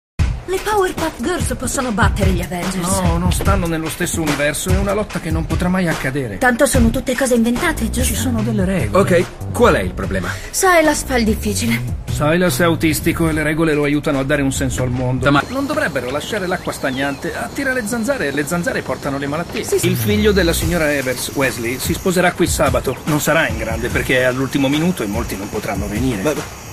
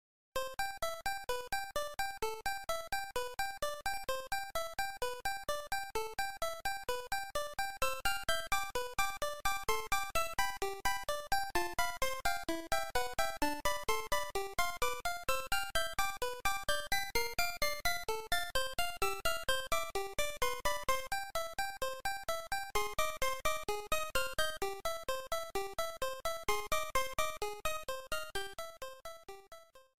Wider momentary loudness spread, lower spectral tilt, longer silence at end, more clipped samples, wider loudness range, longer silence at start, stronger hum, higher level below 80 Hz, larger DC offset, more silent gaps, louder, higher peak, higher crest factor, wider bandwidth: about the same, 7 LU vs 5 LU; first, -5 dB/octave vs -1.5 dB/octave; about the same, 0 s vs 0.05 s; neither; about the same, 3 LU vs 3 LU; about the same, 0.2 s vs 0.3 s; neither; first, -28 dBFS vs -52 dBFS; second, under 0.1% vs 0.7%; neither; first, -17 LUFS vs -37 LUFS; first, 0 dBFS vs -18 dBFS; about the same, 16 dB vs 20 dB; about the same, 15.5 kHz vs 16.5 kHz